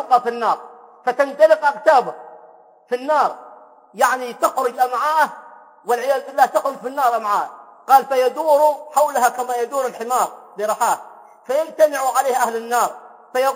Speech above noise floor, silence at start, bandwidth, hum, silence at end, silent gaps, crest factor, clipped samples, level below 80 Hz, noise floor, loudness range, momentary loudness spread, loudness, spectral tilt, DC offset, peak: 29 dB; 0 s; 16.5 kHz; none; 0 s; none; 18 dB; under 0.1%; -78 dBFS; -47 dBFS; 3 LU; 11 LU; -18 LUFS; -2 dB/octave; under 0.1%; 0 dBFS